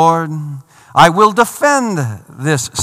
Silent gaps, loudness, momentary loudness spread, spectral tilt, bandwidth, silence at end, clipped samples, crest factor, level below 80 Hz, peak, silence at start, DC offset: none; -13 LUFS; 15 LU; -4.5 dB/octave; 19 kHz; 0 s; 0.9%; 14 dB; -48 dBFS; 0 dBFS; 0 s; under 0.1%